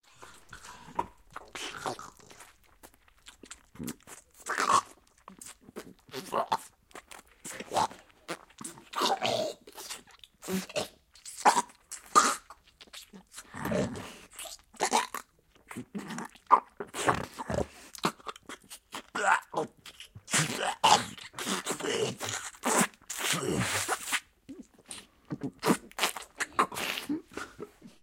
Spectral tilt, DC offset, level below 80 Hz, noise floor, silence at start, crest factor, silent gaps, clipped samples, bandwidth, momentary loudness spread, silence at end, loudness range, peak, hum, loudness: -2.5 dB/octave; under 0.1%; -62 dBFS; -62 dBFS; 0.2 s; 28 dB; none; under 0.1%; 16.5 kHz; 22 LU; 0.15 s; 7 LU; -4 dBFS; none; -31 LUFS